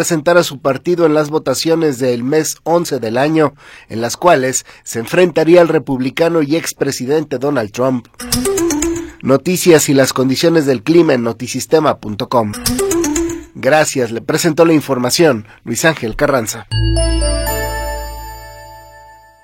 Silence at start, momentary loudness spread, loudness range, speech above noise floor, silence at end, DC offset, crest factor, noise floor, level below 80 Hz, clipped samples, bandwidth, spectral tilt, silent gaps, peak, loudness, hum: 0 s; 10 LU; 4 LU; 27 dB; 0.45 s; under 0.1%; 14 dB; -40 dBFS; -30 dBFS; under 0.1%; 16.5 kHz; -4.5 dB/octave; none; 0 dBFS; -14 LUFS; none